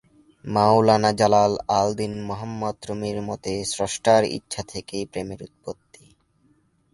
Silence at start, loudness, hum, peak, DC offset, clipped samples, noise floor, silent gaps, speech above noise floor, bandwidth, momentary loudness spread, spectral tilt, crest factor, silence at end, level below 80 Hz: 0.45 s; -22 LUFS; none; -2 dBFS; under 0.1%; under 0.1%; -63 dBFS; none; 41 dB; 11.5 kHz; 18 LU; -5 dB/octave; 20 dB; 1.2 s; -54 dBFS